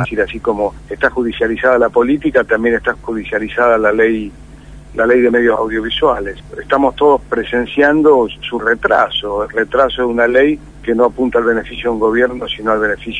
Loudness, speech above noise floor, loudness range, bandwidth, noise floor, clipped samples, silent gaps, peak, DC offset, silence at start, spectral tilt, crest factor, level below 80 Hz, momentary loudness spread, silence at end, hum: -14 LUFS; 21 dB; 2 LU; 10 kHz; -35 dBFS; under 0.1%; none; 0 dBFS; 0.2%; 0 s; -6 dB/octave; 14 dB; -36 dBFS; 8 LU; 0 s; 50 Hz at -40 dBFS